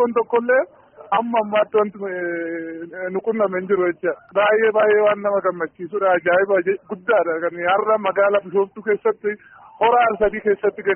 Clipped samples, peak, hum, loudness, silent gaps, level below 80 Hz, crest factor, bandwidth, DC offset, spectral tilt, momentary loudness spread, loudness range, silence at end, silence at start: under 0.1%; -6 dBFS; none; -19 LUFS; none; -56 dBFS; 14 dB; 3.4 kHz; under 0.1%; 0.5 dB/octave; 10 LU; 3 LU; 0 s; 0 s